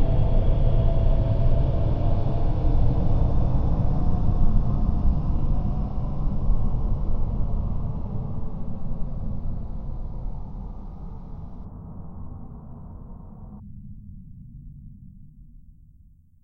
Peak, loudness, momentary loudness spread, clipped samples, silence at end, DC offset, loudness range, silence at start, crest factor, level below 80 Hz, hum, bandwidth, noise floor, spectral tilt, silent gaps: -8 dBFS; -27 LUFS; 19 LU; under 0.1%; 0.85 s; under 0.1%; 18 LU; 0 s; 14 dB; -24 dBFS; none; 3.6 kHz; -53 dBFS; -11 dB/octave; none